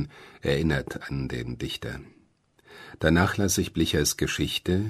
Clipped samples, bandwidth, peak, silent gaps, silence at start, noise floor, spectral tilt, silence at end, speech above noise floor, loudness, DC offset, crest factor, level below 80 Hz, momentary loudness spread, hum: under 0.1%; 13.5 kHz; -6 dBFS; none; 0 s; -63 dBFS; -4.5 dB/octave; 0 s; 36 dB; -26 LUFS; under 0.1%; 20 dB; -42 dBFS; 15 LU; none